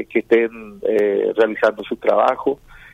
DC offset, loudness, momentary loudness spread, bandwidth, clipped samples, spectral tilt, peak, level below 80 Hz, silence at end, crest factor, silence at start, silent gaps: under 0.1%; -18 LUFS; 8 LU; 8.2 kHz; under 0.1%; -6 dB/octave; -4 dBFS; -54 dBFS; 0.4 s; 16 dB; 0 s; none